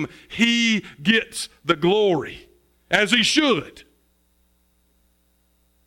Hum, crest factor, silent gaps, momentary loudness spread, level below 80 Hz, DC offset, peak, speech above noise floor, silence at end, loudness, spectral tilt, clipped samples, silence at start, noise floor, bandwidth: none; 20 dB; none; 13 LU; -58 dBFS; under 0.1%; -4 dBFS; 43 dB; 2.05 s; -20 LUFS; -3.5 dB/octave; under 0.1%; 0 s; -64 dBFS; 16.5 kHz